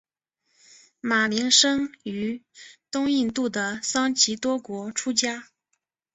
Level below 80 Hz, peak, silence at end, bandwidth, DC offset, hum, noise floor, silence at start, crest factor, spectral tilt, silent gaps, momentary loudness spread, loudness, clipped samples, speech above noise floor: -64 dBFS; -4 dBFS; 0.7 s; 8.4 kHz; under 0.1%; none; -77 dBFS; 1.05 s; 22 dB; -1.5 dB/octave; none; 14 LU; -23 LUFS; under 0.1%; 53 dB